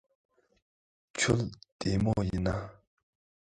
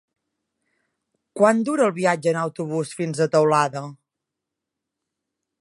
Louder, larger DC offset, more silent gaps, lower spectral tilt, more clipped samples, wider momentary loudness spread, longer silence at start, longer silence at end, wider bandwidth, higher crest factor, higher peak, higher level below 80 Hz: second, -31 LUFS vs -21 LUFS; neither; first, 1.72-1.79 s vs none; about the same, -5 dB/octave vs -5.5 dB/octave; neither; about the same, 12 LU vs 11 LU; second, 1.15 s vs 1.35 s; second, 0.8 s vs 1.65 s; about the same, 11 kHz vs 11.5 kHz; about the same, 22 dB vs 20 dB; second, -12 dBFS vs -2 dBFS; first, -48 dBFS vs -74 dBFS